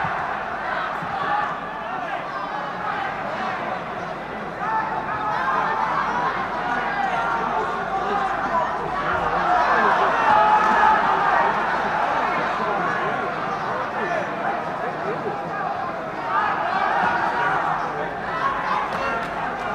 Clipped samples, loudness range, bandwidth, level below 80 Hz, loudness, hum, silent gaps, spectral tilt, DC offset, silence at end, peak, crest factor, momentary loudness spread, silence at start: under 0.1%; 8 LU; 12.5 kHz; -50 dBFS; -22 LUFS; none; none; -5 dB/octave; under 0.1%; 0 s; -4 dBFS; 18 dB; 10 LU; 0 s